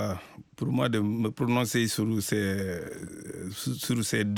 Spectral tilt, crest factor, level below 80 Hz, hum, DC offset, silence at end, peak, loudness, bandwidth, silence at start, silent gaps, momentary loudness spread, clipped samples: -5 dB/octave; 14 dB; -60 dBFS; none; under 0.1%; 0 s; -14 dBFS; -29 LUFS; 17.5 kHz; 0 s; none; 13 LU; under 0.1%